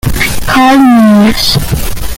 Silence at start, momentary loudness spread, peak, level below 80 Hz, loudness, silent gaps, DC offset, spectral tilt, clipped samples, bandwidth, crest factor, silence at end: 0.05 s; 9 LU; 0 dBFS; -20 dBFS; -7 LUFS; none; under 0.1%; -4.5 dB/octave; 0.5%; 17.5 kHz; 6 dB; 0 s